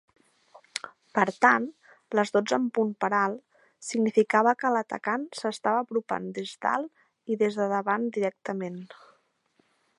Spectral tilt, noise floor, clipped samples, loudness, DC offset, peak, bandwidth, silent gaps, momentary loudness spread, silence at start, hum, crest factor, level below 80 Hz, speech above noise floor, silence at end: -5 dB/octave; -69 dBFS; under 0.1%; -27 LUFS; under 0.1%; -4 dBFS; 11.5 kHz; none; 16 LU; 0.75 s; none; 24 dB; -80 dBFS; 43 dB; 1.15 s